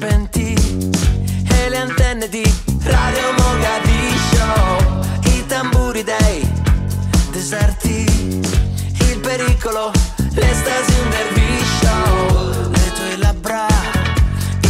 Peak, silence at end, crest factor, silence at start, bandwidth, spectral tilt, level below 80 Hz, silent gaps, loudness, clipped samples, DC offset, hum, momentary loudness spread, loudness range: -4 dBFS; 0 s; 12 dB; 0 s; 16 kHz; -5 dB/octave; -20 dBFS; none; -16 LUFS; under 0.1%; under 0.1%; none; 3 LU; 2 LU